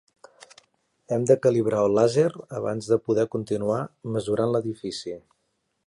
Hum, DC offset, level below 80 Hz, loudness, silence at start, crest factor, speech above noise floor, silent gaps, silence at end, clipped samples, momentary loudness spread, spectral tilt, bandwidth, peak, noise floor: none; under 0.1%; -62 dBFS; -24 LUFS; 1.1 s; 20 dB; 51 dB; none; 0.65 s; under 0.1%; 12 LU; -6.5 dB/octave; 11.5 kHz; -6 dBFS; -75 dBFS